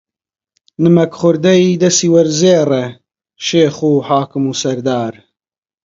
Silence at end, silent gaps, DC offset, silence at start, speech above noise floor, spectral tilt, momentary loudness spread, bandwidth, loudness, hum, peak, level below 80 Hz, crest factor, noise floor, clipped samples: 0.75 s; none; under 0.1%; 0.8 s; over 78 dB; -5 dB/octave; 8 LU; 7.8 kHz; -13 LUFS; none; 0 dBFS; -58 dBFS; 14 dB; under -90 dBFS; under 0.1%